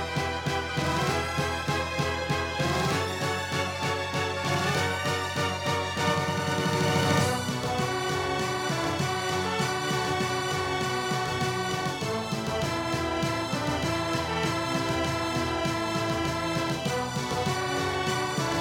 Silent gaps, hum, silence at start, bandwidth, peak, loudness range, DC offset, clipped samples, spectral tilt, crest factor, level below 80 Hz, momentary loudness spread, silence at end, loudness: none; none; 0 s; 18 kHz; -12 dBFS; 2 LU; under 0.1%; under 0.1%; -4.5 dB/octave; 16 dB; -52 dBFS; 3 LU; 0 s; -28 LUFS